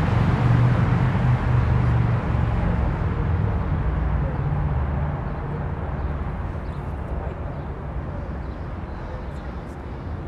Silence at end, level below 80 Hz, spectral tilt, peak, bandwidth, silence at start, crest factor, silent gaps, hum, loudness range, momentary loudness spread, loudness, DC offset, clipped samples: 0 s; -28 dBFS; -9 dB/octave; -6 dBFS; 5.8 kHz; 0 s; 18 dB; none; none; 10 LU; 13 LU; -24 LUFS; under 0.1%; under 0.1%